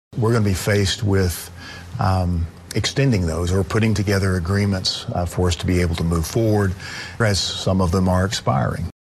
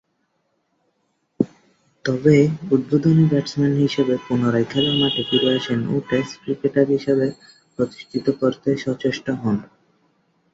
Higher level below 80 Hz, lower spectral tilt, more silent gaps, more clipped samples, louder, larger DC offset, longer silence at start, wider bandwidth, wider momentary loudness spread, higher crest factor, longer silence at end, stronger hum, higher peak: first, -36 dBFS vs -58 dBFS; second, -5.5 dB/octave vs -7 dB/octave; neither; neither; about the same, -20 LUFS vs -20 LUFS; neither; second, 0.1 s vs 1.4 s; first, 13 kHz vs 7.8 kHz; second, 6 LU vs 9 LU; about the same, 14 dB vs 18 dB; second, 0.1 s vs 0.9 s; neither; second, -6 dBFS vs -2 dBFS